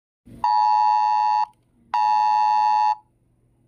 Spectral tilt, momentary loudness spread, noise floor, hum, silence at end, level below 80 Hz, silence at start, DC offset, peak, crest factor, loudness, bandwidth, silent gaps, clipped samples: -1.5 dB/octave; 9 LU; -62 dBFS; none; 0.7 s; -64 dBFS; 0.35 s; under 0.1%; -10 dBFS; 10 dB; -20 LUFS; 6.8 kHz; none; under 0.1%